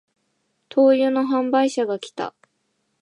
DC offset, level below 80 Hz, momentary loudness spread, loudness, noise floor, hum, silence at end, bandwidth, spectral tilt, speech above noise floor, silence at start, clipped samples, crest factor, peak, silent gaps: under 0.1%; -78 dBFS; 15 LU; -20 LUFS; -71 dBFS; none; 0.7 s; 10.5 kHz; -4.5 dB/octave; 52 dB; 0.75 s; under 0.1%; 16 dB; -6 dBFS; none